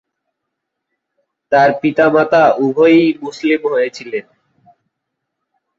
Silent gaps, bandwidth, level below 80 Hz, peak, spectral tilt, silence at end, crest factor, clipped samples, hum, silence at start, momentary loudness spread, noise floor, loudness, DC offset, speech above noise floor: none; 7.6 kHz; -62 dBFS; -2 dBFS; -6.5 dB/octave; 1.55 s; 14 dB; under 0.1%; none; 1.5 s; 10 LU; -76 dBFS; -13 LUFS; under 0.1%; 64 dB